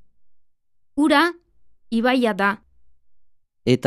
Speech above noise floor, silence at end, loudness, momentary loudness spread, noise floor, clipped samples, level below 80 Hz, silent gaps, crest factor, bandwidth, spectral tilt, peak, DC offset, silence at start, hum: 39 dB; 0 s; -20 LUFS; 12 LU; -58 dBFS; under 0.1%; -58 dBFS; none; 20 dB; 14 kHz; -5.5 dB/octave; -4 dBFS; under 0.1%; 0.95 s; none